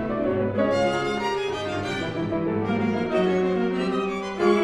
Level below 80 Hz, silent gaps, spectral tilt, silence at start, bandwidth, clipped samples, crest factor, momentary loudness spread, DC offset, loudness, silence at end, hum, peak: -50 dBFS; none; -6.5 dB/octave; 0 s; 11 kHz; under 0.1%; 16 dB; 5 LU; under 0.1%; -25 LUFS; 0 s; none; -8 dBFS